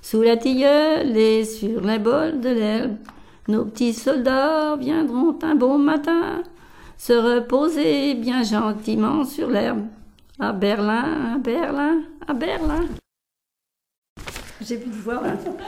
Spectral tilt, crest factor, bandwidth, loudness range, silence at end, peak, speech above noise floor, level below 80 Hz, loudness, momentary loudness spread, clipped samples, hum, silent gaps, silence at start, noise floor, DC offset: -5.5 dB/octave; 16 dB; 16 kHz; 6 LU; 0 s; -6 dBFS; 65 dB; -44 dBFS; -21 LUFS; 12 LU; under 0.1%; none; 13.98-14.02 s, 14.09-14.16 s; 0.05 s; -85 dBFS; under 0.1%